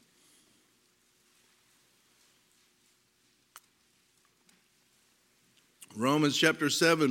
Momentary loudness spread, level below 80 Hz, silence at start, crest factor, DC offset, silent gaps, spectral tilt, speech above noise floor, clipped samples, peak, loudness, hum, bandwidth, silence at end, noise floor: 8 LU; -82 dBFS; 5.95 s; 26 dB; under 0.1%; none; -3.5 dB/octave; 44 dB; under 0.1%; -8 dBFS; -27 LUFS; 60 Hz at -80 dBFS; 17 kHz; 0 s; -70 dBFS